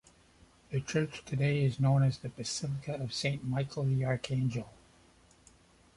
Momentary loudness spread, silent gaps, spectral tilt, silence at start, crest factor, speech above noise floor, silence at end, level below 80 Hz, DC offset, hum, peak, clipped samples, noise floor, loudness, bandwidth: 10 LU; none; -6 dB/octave; 0.7 s; 16 dB; 31 dB; 1.25 s; -60 dBFS; under 0.1%; none; -16 dBFS; under 0.1%; -62 dBFS; -33 LUFS; 11.5 kHz